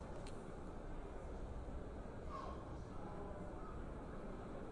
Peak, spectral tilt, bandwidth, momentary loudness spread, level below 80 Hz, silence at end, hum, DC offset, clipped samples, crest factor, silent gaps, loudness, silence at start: -36 dBFS; -7 dB/octave; 11 kHz; 3 LU; -52 dBFS; 0 s; none; under 0.1%; under 0.1%; 12 dB; none; -51 LUFS; 0 s